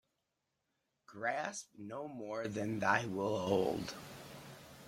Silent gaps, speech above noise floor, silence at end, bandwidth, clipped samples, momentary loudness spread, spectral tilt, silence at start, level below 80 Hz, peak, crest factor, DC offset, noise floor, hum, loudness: none; 48 dB; 0 s; 16.5 kHz; under 0.1%; 18 LU; -5 dB/octave; 1.1 s; -72 dBFS; -16 dBFS; 24 dB; under 0.1%; -86 dBFS; none; -38 LUFS